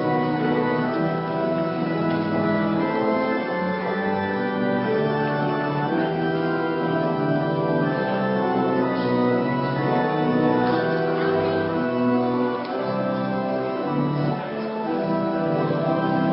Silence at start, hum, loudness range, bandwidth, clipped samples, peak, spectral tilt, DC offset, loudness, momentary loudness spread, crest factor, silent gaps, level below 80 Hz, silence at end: 0 s; none; 2 LU; 5.8 kHz; under 0.1%; -8 dBFS; -12 dB/octave; under 0.1%; -23 LUFS; 3 LU; 14 dB; none; -58 dBFS; 0 s